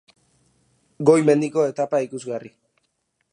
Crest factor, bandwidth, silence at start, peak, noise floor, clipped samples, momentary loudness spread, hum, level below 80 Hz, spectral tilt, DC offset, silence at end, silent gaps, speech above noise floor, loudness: 20 dB; 10.5 kHz; 1 s; -2 dBFS; -72 dBFS; under 0.1%; 15 LU; none; -74 dBFS; -6.5 dB/octave; under 0.1%; 0.85 s; none; 52 dB; -20 LUFS